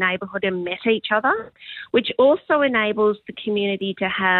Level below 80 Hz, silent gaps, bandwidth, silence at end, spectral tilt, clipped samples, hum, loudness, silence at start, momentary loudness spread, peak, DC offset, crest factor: -62 dBFS; none; 4.4 kHz; 0 s; -8.5 dB/octave; under 0.1%; none; -21 LUFS; 0 s; 8 LU; -6 dBFS; under 0.1%; 16 dB